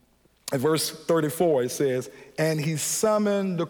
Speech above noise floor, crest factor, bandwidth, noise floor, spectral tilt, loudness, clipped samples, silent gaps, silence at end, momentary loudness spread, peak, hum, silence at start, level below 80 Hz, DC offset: 20 dB; 14 dB; over 20 kHz; -44 dBFS; -4.5 dB/octave; -25 LUFS; under 0.1%; none; 0 s; 8 LU; -10 dBFS; none; 0.45 s; -66 dBFS; under 0.1%